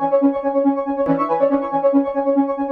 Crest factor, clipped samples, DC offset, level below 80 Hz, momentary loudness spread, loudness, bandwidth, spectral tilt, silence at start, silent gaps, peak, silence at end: 14 dB; under 0.1%; under 0.1%; -54 dBFS; 2 LU; -18 LUFS; 4.4 kHz; -10 dB/octave; 0 s; none; -4 dBFS; 0 s